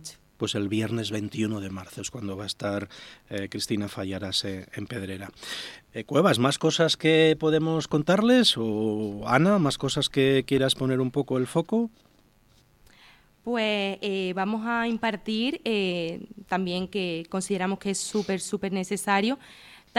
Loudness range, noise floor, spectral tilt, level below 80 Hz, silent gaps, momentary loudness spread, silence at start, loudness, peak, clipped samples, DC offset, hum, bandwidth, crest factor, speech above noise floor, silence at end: 9 LU; -60 dBFS; -5 dB/octave; -60 dBFS; none; 14 LU; 0 s; -26 LUFS; -4 dBFS; under 0.1%; under 0.1%; none; 16 kHz; 22 dB; 34 dB; 0 s